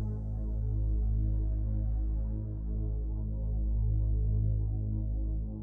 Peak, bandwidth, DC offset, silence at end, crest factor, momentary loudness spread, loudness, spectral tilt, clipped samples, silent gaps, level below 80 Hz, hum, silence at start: -20 dBFS; 1.1 kHz; under 0.1%; 0 s; 10 dB; 5 LU; -34 LUFS; -13.5 dB/octave; under 0.1%; none; -32 dBFS; none; 0 s